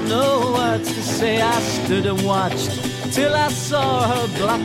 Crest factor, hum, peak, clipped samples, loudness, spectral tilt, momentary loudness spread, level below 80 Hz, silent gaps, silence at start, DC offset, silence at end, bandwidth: 14 dB; none; -6 dBFS; under 0.1%; -19 LUFS; -4.5 dB/octave; 5 LU; -50 dBFS; none; 0 s; under 0.1%; 0 s; 16.5 kHz